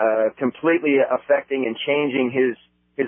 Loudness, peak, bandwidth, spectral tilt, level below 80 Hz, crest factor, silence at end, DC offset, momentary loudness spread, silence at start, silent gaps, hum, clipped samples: -21 LUFS; -6 dBFS; 3.6 kHz; -10 dB/octave; -72 dBFS; 14 dB; 0 s; under 0.1%; 6 LU; 0 s; none; none; under 0.1%